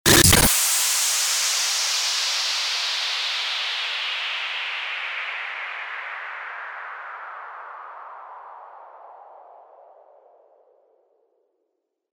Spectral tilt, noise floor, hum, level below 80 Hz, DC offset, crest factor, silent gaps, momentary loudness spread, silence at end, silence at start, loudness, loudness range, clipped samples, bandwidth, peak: -1.5 dB/octave; -77 dBFS; none; -42 dBFS; under 0.1%; 22 dB; none; 22 LU; 2.3 s; 0.05 s; -21 LUFS; 21 LU; under 0.1%; over 20 kHz; -2 dBFS